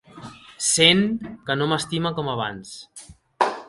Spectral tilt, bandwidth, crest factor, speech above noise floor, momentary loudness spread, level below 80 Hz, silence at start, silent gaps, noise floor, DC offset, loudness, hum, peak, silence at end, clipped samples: -3 dB/octave; 11.5 kHz; 22 dB; 20 dB; 26 LU; -58 dBFS; 0.15 s; none; -42 dBFS; under 0.1%; -21 LUFS; none; 0 dBFS; 0.05 s; under 0.1%